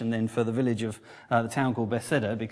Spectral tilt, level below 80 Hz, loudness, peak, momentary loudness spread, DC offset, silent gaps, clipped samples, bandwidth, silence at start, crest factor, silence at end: -6.5 dB/octave; -64 dBFS; -28 LUFS; -10 dBFS; 5 LU; under 0.1%; none; under 0.1%; 11 kHz; 0 s; 18 dB; 0 s